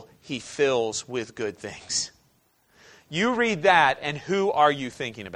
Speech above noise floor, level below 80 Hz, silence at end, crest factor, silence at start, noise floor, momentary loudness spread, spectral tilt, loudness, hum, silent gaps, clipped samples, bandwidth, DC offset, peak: 40 dB; -64 dBFS; 0 s; 22 dB; 0 s; -65 dBFS; 15 LU; -3 dB/octave; -24 LUFS; none; none; under 0.1%; 11 kHz; under 0.1%; -4 dBFS